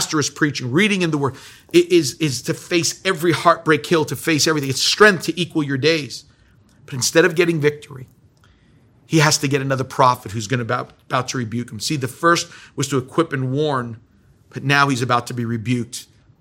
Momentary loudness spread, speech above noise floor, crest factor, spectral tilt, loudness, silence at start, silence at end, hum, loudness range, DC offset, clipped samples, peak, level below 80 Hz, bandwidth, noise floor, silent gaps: 10 LU; 34 dB; 20 dB; -4 dB/octave; -18 LUFS; 0 s; 0.4 s; none; 5 LU; under 0.1%; under 0.1%; 0 dBFS; -60 dBFS; 17 kHz; -53 dBFS; none